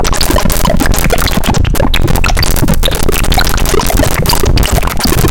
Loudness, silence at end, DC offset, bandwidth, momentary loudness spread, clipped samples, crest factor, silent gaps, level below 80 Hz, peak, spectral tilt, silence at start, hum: -11 LUFS; 0 s; under 0.1%; 17.5 kHz; 1 LU; under 0.1%; 8 dB; none; -12 dBFS; 0 dBFS; -4 dB/octave; 0 s; none